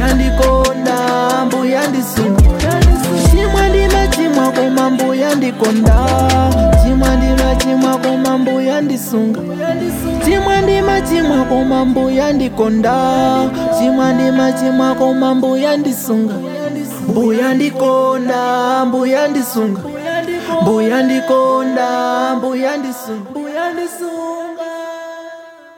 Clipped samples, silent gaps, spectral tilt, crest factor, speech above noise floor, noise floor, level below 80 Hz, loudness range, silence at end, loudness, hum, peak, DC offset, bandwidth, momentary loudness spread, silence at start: under 0.1%; none; -6 dB/octave; 12 dB; 21 dB; -34 dBFS; -20 dBFS; 3 LU; 0.25 s; -14 LUFS; none; -2 dBFS; under 0.1%; 18 kHz; 9 LU; 0 s